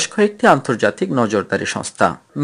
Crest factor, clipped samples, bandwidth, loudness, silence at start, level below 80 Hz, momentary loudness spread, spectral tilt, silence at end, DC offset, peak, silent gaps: 16 dB; under 0.1%; 12 kHz; -17 LUFS; 0 s; -58 dBFS; 7 LU; -4.5 dB/octave; 0 s; under 0.1%; 0 dBFS; none